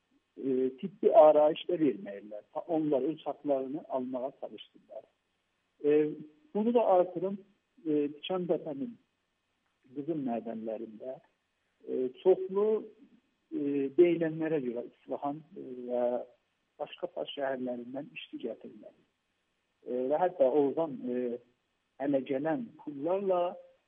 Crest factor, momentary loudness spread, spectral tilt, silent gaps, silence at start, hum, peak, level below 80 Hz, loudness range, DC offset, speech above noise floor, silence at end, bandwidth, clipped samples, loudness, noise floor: 22 dB; 18 LU; -5.5 dB/octave; none; 0.35 s; none; -10 dBFS; -86 dBFS; 10 LU; under 0.1%; 49 dB; 0.25 s; 3.8 kHz; under 0.1%; -31 LUFS; -79 dBFS